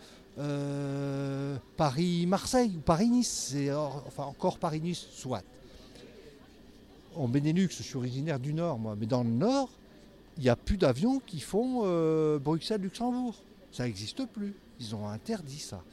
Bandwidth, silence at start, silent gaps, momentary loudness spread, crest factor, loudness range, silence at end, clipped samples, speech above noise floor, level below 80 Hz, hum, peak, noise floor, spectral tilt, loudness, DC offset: 14.5 kHz; 0 s; none; 13 LU; 20 dB; 7 LU; 0.05 s; under 0.1%; 24 dB; -52 dBFS; none; -12 dBFS; -55 dBFS; -6 dB/octave; -31 LUFS; under 0.1%